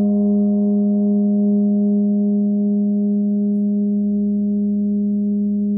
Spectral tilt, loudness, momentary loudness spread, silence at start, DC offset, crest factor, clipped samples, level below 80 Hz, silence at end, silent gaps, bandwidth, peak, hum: -16.5 dB/octave; -18 LUFS; 3 LU; 0 s; under 0.1%; 6 dB; under 0.1%; -56 dBFS; 0 s; none; 1.1 kHz; -10 dBFS; none